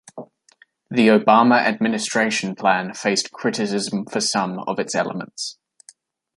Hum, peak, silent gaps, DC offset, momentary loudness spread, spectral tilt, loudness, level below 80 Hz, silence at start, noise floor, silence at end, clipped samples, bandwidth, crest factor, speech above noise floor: none; -2 dBFS; none; under 0.1%; 14 LU; -4 dB/octave; -20 LUFS; -68 dBFS; 0.15 s; -56 dBFS; 0.85 s; under 0.1%; 11.5 kHz; 18 dB; 37 dB